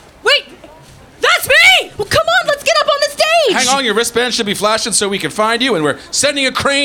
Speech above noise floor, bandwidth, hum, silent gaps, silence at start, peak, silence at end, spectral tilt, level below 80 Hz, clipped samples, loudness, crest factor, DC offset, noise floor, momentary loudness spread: 25 dB; 19 kHz; none; none; 0.25 s; -2 dBFS; 0 s; -1.5 dB/octave; -46 dBFS; under 0.1%; -12 LUFS; 12 dB; under 0.1%; -39 dBFS; 7 LU